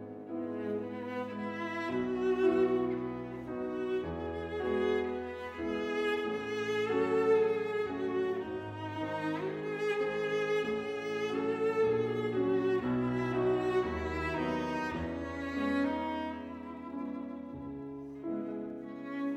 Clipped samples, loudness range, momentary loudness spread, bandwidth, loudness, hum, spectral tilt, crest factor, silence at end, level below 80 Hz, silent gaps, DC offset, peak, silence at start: under 0.1%; 5 LU; 11 LU; 9.4 kHz; -34 LUFS; none; -6.5 dB/octave; 16 dB; 0 s; -60 dBFS; none; under 0.1%; -18 dBFS; 0 s